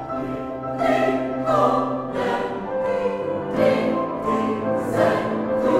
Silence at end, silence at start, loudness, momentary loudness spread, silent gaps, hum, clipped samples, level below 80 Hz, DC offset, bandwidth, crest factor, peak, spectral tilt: 0 s; 0 s; -22 LUFS; 7 LU; none; none; under 0.1%; -52 dBFS; under 0.1%; 14 kHz; 16 dB; -6 dBFS; -7 dB/octave